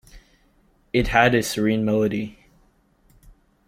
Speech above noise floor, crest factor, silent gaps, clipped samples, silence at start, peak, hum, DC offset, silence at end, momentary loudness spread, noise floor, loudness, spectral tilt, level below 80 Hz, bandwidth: 40 dB; 22 dB; none; under 0.1%; 0.15 s; -2 dBFS; none; under 0.1%; 1.35 s; 10 LU; -60 dBFS; -21 LUFS; -5 dB/octave; -42 dBFS; 16.5 kHz